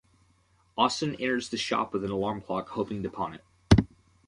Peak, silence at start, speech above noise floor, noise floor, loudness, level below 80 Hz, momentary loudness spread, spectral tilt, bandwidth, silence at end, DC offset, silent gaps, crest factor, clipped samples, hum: -4 dBFS; 0.75 s; 36 dB; -66 dBFS; -28 LUFS; -42 dBFS; 12 LU; -5.5 dB/octave; 11.5 kHz; 0.4 s; under 0.1%; none; 26 dB; under 0.1%; none